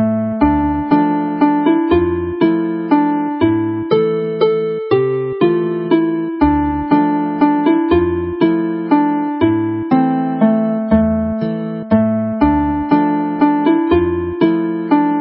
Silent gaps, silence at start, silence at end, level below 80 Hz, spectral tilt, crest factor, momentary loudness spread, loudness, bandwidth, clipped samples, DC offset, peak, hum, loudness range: none; 0 s; 0 s; -34 dBFS; -12 dB/octave; 14 dB; 4 LU; -15 LUFS; 5.4 kHz; under 0.1%; under 0.1%; 0 dBFS; none; 1 LU